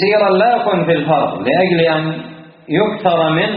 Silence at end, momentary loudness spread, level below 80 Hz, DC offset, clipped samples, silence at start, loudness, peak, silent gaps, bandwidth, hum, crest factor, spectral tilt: 0 s; 8 LU; -54 dBFS; under 0.1%; under 0.1%; 0 s; -14 LUFS; 0 dBFS; none; 5 kHz; none; 14 dB; -4 dB/octave